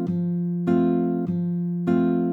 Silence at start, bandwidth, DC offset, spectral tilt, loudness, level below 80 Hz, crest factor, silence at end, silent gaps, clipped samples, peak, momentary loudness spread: 0 s; 4.1 kHz; under 0.1%; -11 dB/octave; -23 LUFS; -64 dBFS; 12 dB; 0 s; none; under 0.1%; -10 dBFS; 5 LU